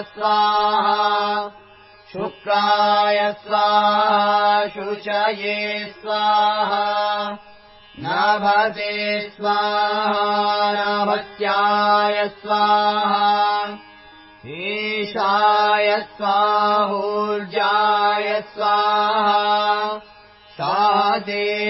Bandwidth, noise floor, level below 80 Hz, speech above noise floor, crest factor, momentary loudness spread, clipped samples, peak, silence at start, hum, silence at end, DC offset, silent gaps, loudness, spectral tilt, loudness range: 5.8 kHz; -47 dBFS; -64 dBFS; 28 dB; 16 dB; 9 LU; under 0.1%; -4 dBFS; 0 s; none; 0 s; under 0.1%; none; -19 LUFS; -7.5 dB/octave; 3 LU